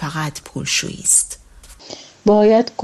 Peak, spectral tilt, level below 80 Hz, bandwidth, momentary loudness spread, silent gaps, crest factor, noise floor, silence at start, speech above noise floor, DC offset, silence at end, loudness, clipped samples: 0 dBFS; -3 dB/octave; -48 dBFS; 13.5 kHz; 22 LU; none; 18 dB; -41 dBFS; 0 s; 24 dB; under 0.1%; 0 s; -16 LUFS; under 0.1%